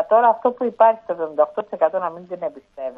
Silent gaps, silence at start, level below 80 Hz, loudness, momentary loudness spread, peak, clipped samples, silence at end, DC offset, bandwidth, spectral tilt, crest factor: none; 0 s; -68 dBFS; -20 LUFS; 14 LU; -2 dBFS; under 0.1%; 0.05 s; under 0.1%; 3.8 kHz; -8 dB/octave; 18 dB